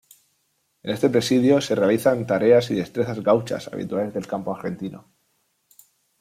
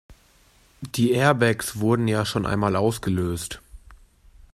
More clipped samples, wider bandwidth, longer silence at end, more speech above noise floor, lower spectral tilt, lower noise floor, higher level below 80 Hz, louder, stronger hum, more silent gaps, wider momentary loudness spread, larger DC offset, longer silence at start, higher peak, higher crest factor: neither; about the same, 16 kHz vs 15.5 kHz; first, 1.2 s vs 0.6 s; first, 49 dB vs 35 dB; about the same, -6 dB/octave vs -5.5 dB/octave; first, -70 dBFS vs -57 dBFS; second, -62 dBFS vs -48 dBFS; about the same, -21 LUFS vs -23 LUFS; neither; neither; about the same, 13 LU vs 13 LU; neither; first, 0.85 s vs 0.1 s; about the same, -4 dBFS vs -4 dBFS; about the same, 18 dB vs 20 dB